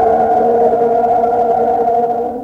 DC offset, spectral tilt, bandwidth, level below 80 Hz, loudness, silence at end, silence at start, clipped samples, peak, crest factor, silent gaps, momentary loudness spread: under 0.1%; -8 dB/octave; 6.2 kHz; -46 dBFS; -13 LUFS; 0 s; 0 s; under 0.1%; -2 dBFS; 10 dB; none; 2 LU